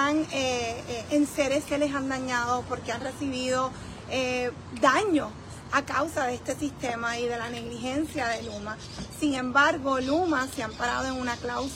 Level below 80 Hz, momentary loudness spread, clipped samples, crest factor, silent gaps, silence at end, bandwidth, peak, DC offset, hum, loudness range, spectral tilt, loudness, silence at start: -52 dBFS; 10 LU; under 0.1%; 20 dB; none; 0 s; 16 kHz; -8 dBFS; under 0.1%; none; 3 LU; -4 dB/octave; -28 LUFS; 0 s